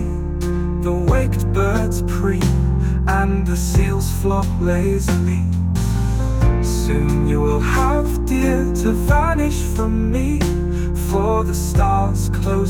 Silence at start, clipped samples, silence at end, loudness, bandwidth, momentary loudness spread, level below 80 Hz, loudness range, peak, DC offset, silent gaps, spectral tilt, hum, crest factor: 0 s; under 0.1%; 0 s; -18 LUFS; 18 kHz; 3 LU; -22 dBFS; 1 LU; -4 dBFS; under 0.1%; none; -6.5 dB/octave; none; 14 dB